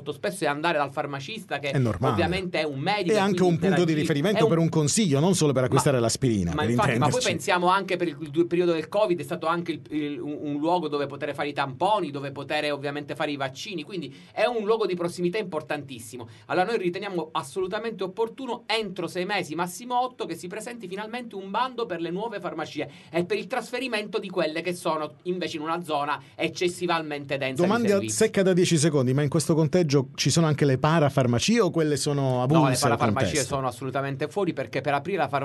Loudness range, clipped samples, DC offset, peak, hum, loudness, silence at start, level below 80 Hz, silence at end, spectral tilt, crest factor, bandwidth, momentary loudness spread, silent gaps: 7 LU; under 0.1%; under 0.1%; -6 dBFS; none; -25 LUFS; 0 s; -58 dBFS; 0 s; -5 dB/octave; 20 dB; 12 kHz; 10 LU; none